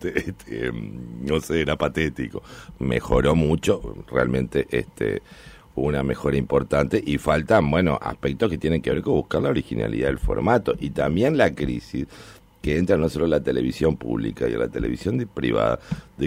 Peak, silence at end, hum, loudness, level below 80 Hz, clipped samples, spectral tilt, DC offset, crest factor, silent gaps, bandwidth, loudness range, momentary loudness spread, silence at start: -6 dBFS; 0 s; none; -23 LUFS; -38 dBFS; under 0.1%; -7 dB/octave; under 0.1%; 16 dB; none; 16 kHz; 2 LU; 10 LU; 0 s